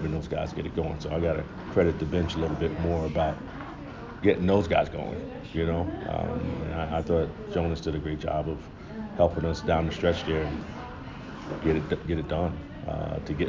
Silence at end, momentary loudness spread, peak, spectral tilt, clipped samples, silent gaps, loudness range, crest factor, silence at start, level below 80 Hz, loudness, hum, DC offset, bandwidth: 0 s; 13 LU; -8 dBFS; -7.5 dB/octave; under 0.1%; none; 3 LU; 20 dB; 0 s; -40 dBFS; -29 LUFS; none; under 0.1%; 7.6 kHz